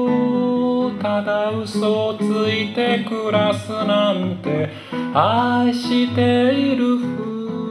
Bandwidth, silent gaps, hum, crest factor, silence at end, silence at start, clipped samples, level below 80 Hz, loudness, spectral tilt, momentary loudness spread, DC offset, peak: 11.5 kHz; none; none; 16 dB; 0 s; 0 s; under 0.1%; -66 dBFS; -19 LUFS; -6.5 dB/octave; 6 LU; under 0.1%; -2 dBFS